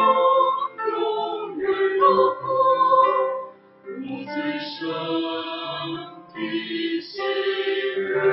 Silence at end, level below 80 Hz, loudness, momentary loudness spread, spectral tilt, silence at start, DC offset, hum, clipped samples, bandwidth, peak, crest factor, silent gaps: 0 s; -70 dBFS; -23 LUFS; 15 LU; -7.5 dB/octave; 0 s; under 0.1%; none; under 0.1%; 5.8 kHz; -6 dBFS; 16 dB; none